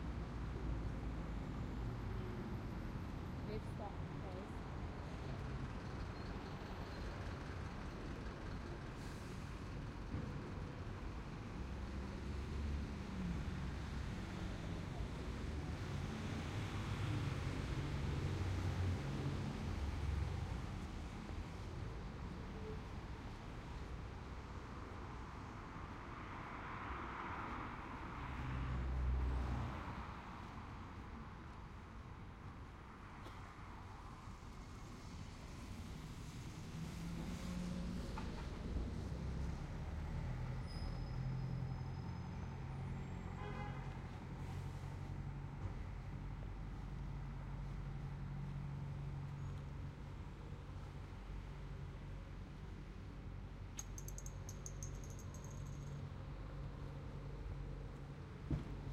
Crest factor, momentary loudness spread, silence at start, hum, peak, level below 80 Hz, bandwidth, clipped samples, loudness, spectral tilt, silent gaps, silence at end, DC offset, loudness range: 18 dB; 9 LU; 0 s; none; -28 dBFS; -50 dBFS; 14.5 kHz; under 0.1%; -48 LUFS; -6.5 dB/octave; none; 0 s; under 0.1%; 8 LU